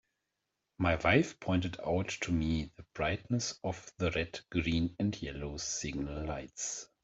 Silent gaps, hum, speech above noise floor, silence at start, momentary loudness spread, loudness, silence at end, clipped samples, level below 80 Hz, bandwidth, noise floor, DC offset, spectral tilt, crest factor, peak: none; none; 52 dB; 0.8 s; 10 LU; -34 LUFS; 0.2 s; under 0.1%; -52 dBFS; 8.2 kHz; -86 dBFS; under 0.1%; -4.5 dB/octave; 22 dB; -14 dBFS